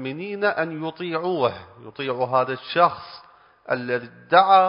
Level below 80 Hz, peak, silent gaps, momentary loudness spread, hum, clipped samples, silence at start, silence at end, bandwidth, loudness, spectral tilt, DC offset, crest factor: -64 dBFS; -2 dBFS; none; 13 LU; none; under 0.1%; 0 s; 0 s; 5.4 kHz; -23 LUFS; -9.5 dB/octave; under 0.1%; 20 dB